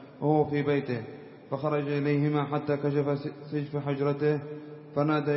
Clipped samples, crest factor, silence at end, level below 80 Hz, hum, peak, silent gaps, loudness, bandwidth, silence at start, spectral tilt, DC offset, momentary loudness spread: under 0.1%; 16 dB; 0 s; -68 dBFS; none; -12 dBFS; none; -29 LUFS; 5.8 kHz; 0 s; -11.5 dB/octave; under 0.1%; 10 LU